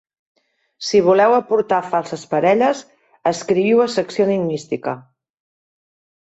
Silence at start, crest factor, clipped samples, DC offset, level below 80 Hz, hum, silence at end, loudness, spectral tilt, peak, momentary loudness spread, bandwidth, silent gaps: 0.8 s; 16 dB; under 0.1%; under 0.1%; -62 dBFS; none; 1.2 s; -18 LUFS; -5.5 dB/octave; -2 dBFS; 11 LU; 8.2 kHz; none